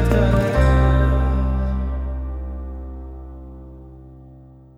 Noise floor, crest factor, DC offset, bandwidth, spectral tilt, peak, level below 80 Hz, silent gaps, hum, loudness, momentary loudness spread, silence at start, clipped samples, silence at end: -44 dBFS; 16 dB; under 0.1%; 8.2 kHz; -8 dB/octave; -4 dBFS; -22 dBFS; none; none; -20 LUFS; 23 LU; 0 s; under 0.1%; 0.35 s